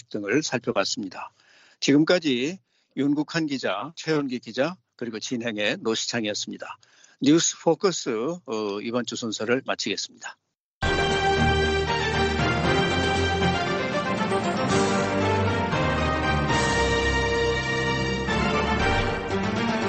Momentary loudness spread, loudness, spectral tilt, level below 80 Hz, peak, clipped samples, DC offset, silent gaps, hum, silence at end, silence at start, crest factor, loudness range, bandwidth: 9 LU; -24 LUFS; -4.5 dB/octave; -40 dBFS; -8 dBFS; under 0.1%; under 0.1%; 10.60-10.81 s; none; 0 s; 0.1 s; 18 dB; 5 LU; 8.8 kHz